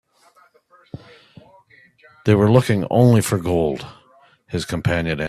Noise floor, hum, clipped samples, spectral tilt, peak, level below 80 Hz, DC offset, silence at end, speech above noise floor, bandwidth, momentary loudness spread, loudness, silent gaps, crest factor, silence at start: -55 dBFS; none; under 0.1%; -6.5 dB/octave; 0 dBFS; -48 dBFS; under 0.1%; 0 s; 38 dB; 14 kHz; 25 LU; -18 LUFS; none; 20 dB; 2.25 s